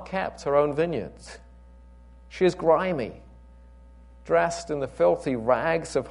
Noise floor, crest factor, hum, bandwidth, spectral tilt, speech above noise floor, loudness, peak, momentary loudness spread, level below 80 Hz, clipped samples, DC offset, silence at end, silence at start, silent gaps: -49 dBFS; 18 dB; 60 Hz at -50 dBFS; 11 kHz; -6 dB/octave; 24 dB; -25 LUFS; -8 dBFS; 13 LU; -50 dBFS; under 0.1%; under 0.1%; 0 s; 0 s; none